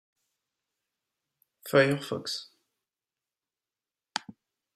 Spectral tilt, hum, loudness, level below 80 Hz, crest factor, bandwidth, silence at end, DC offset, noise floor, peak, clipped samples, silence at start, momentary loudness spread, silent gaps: -4.5 dB/octave; none; -29 LUFS; -76 dBFS; 26 dB; 16 kHz; 0.45 s; under 0.1%; under -90 dBFS; -8 dBFS; under 0.1%; 1.65 s; 14 LU; none